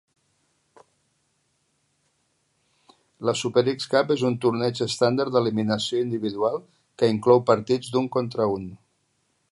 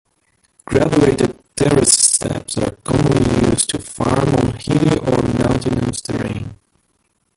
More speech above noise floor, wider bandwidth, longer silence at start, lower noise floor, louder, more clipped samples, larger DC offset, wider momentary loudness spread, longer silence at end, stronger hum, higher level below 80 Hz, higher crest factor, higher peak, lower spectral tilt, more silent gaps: about the same, 48 dB vs 49 dB; about the same, 11.5 kHz vs 12 kHz; first, 3.2 s vs 0.7 s; first, -71 dBFS vs -65 dBFS; second, -23 LUFS vs -16 LUFS; neither; neither; second, 8 LU vs 11 LU; about the same, 0.75 s vs 0.85 s; neither; second, -64 dBFS vs -36 dBFS; first, 22 dB vs 16 dB; second, -4 dBFS vs 0 dBFS; about the same, -5.5 dB/octave vs -4.5 dB/octave; neither